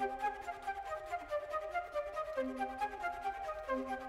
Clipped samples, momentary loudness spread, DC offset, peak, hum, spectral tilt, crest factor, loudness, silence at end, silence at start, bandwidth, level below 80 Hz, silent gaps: under 0.1%; 3 LU; under 0.1%; -24 dBFS; none; -4.5 dB/octave; 16 dB; -40 LUFS; 0 s; 0 s; 16 kHz; -62 dBFS; none